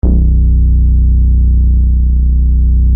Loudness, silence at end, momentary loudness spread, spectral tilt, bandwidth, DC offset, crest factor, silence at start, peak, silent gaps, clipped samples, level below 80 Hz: -11 LUFS; 0 s; 1 LU; -15 dB/octave; 0.8 kHz; under 0.1%; 8 dB; 0.05 s; 0 dBFS; none; under 0.1%; -8 dBFS